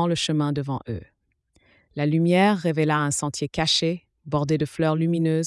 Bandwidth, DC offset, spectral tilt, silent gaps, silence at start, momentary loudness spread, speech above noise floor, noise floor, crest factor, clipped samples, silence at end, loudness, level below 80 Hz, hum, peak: 12 kHz; under 0.1%; -5 dB/octave; none; 0 s; 11 LU; 44 dB; -67 dBFS; 16 dB; under 0.1%; 0 s; -23 LUFS; -54 dBFS; none; -8 dBFS